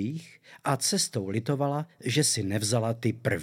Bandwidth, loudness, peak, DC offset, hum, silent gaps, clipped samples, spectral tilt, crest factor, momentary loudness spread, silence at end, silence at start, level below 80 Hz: 16.5 kHz; -28 LUFS; -10 dBFS; under 0.1%; none; none; under 0.1%; -4 dB/octave; 18 dB; 8 LU; 0 s; 0 s; -70 dBFS